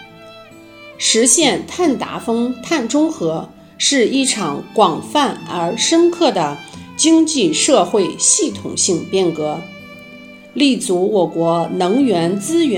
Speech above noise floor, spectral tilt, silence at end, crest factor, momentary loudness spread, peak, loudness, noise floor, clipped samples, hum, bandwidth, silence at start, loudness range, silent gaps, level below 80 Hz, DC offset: 24 dB; -3 dB/octave; 0 s; 16 dB; 10 LU; 0 dBFS; -15 LUFS; -39 dBFS; under 0.1%; none; 16 kHz; 0 s; 3 LU; none; -60 dBFS; under 0.1%